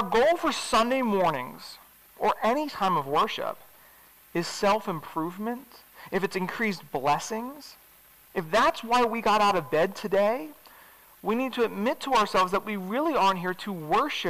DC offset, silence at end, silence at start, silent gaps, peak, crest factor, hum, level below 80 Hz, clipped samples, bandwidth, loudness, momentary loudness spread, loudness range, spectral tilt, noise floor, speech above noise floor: 0.3%; 0 s; 0 s; none; -18 dBFS; 10 dB; none; -58 dBFS; under 0.1%; 16 kHz; -26 LUFS; 12 LU; 5 LU; -4.5 dB/octave; -56 dBFS; 29 dB